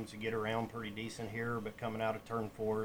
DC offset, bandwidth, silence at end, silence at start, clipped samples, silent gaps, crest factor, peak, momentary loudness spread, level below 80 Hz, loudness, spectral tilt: under 0.1%; over 20 kHz; 0 s; 0 s; under 0.1%; none; 16 dB; -22 dBFS; 5 LU; -64 dBFS; -39 LUFS; -6 dB/octave